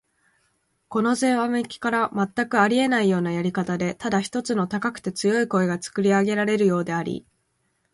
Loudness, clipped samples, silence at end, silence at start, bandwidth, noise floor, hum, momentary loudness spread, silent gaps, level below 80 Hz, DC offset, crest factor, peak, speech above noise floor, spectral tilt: -23 LUFS; under 0.1%; 0.7 s; 0.9 s; 11.5 kHz; -71 dBFS; none; 7 LU; none; -62 dBFS; under 0.1%; 16 dB; -6 dBFS; 49 dB; -5.5 dB/octave